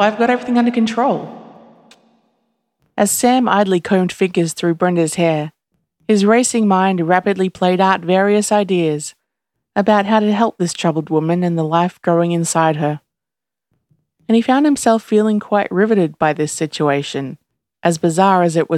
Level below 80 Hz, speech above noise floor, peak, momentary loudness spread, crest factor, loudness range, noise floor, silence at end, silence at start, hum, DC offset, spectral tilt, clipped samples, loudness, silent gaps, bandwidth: -62 dBFS; 72 dB; 0 dBFS; 7 LU; 16 dB; 3 LU; -86 dBFS; 0 s; 0 s; none; under 0.1%; -5 dB/octave; under 0.1%; -16 LUFS; none; 14.5 kHz